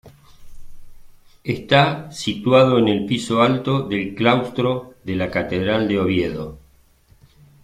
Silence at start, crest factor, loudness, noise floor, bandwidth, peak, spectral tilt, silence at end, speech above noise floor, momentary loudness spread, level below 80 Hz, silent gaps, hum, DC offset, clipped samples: 0.05 s; 20 dB; -19 LUFS; -54 dBFS; 14.5 kHz; 0 dBFS; -6 dB/octave; 1.05 s; 35 dB; 12 LU; -48 dBFS; none; none; under 0.1%; under 0.1%